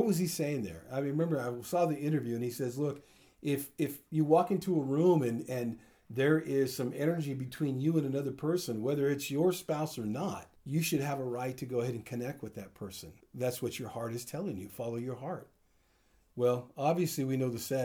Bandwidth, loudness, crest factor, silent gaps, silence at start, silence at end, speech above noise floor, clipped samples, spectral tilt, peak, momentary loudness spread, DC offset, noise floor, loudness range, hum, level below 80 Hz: over 20 kHz; -33 LUFS; 20 dB; none; 0 s; 0 s; 37 dB; under 0.1%; -6 dB/octave; -14 dBFS; 12 LU; under 0.1%; -70 dBFS; 8 LU; none; -70 dBFS